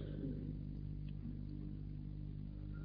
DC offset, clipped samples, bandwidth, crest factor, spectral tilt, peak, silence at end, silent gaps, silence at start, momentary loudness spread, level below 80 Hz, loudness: under 0.1%; under 0.1%; 5.2 kHz; 14 dB; -10 dB/octave; -32 dBFS; 0 s; none; 0 s; 4 LU; -50 dBFS; -48 LUFS